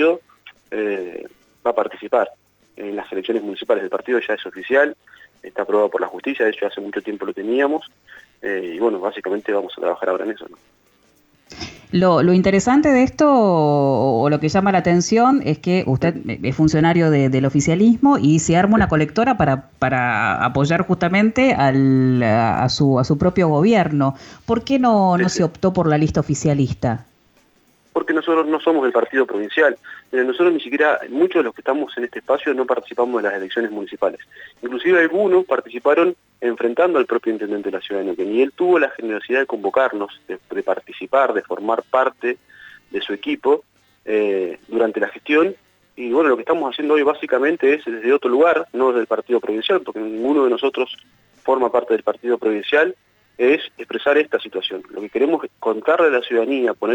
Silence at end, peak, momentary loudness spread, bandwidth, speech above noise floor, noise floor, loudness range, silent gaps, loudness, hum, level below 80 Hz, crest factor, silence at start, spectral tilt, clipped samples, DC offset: 0 s; -4 dBFS; 11 LU; 19 kHz; 40 dB; -57 dBFS; 6 LU; none; -18 LUFS; none; -48 dBFS; 14 dB; 0 s; -6 dB/octave; under 0.1%; under 0.1%